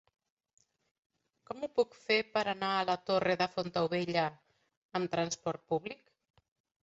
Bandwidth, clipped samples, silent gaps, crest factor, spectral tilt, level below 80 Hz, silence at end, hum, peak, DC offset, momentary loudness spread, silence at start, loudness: 8 kHz; under 0.1%; 4.77-4.89 s; 20 dB; -3 dB/octave; -74 dBFS; 0.9 s; none; -16 dBFS; under 0.1%; 9 LU; 1.5 s; -33 LUFS